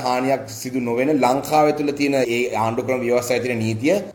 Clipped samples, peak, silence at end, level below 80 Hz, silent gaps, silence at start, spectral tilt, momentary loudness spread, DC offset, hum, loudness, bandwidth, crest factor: under 0.1%; -4 dBFS; 0 s; -56 dBFS; none; 0 s; -5 dB/octave; 5 LU; under 0.1%; none; -20 LUFS; 19 kHz; 16 dB